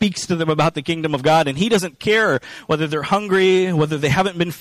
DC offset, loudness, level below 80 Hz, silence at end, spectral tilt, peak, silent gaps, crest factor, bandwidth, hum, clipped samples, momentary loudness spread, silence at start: under 0.1%; -18 LUFS; -50 dBFS; 0 s; -5 dB/octave; -6 dBFS; none; 12 dB; 15 kHz; none; under 0.1%; 6 LU; 0 s